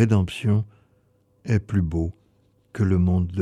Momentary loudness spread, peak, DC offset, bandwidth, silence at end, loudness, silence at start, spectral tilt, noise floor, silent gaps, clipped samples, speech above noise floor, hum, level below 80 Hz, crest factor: 15 LU; -6 dBFS; under 0.1%; 11 kHz; 0 s; -23 LUFS; 0 s; -8 dB/octave; -63 dBFS; none; under 0.1%; 42 dB; none; -40 dBFS; 16 dB